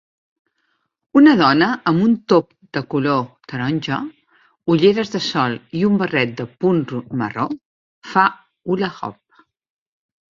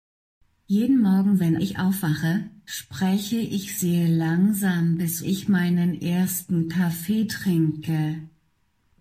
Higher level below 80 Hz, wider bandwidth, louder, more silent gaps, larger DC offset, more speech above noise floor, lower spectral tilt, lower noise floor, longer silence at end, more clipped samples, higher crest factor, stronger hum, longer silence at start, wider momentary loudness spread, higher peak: about the same, -58 dBFS vs -60 dBFS; second, 7.4 kHz vs 16 kHz; first, -18 LUFS vs -23 LUFS; first, 7.66-8.02 s vs none; neither; first, 52 dB vs 46 dB; about the same, -6.5 dB/octave vs -6 dB/octave; about the same, -69 dBFS vs -68 dBFS; first, 1.2 s vs 0.75 s; neither; first, 18 dB vs 12 dB; neither; first, 1.15 s vs 0.7 s; first, 14 LU vs 7 LU; first, -2 dBFS vs -12 dBFS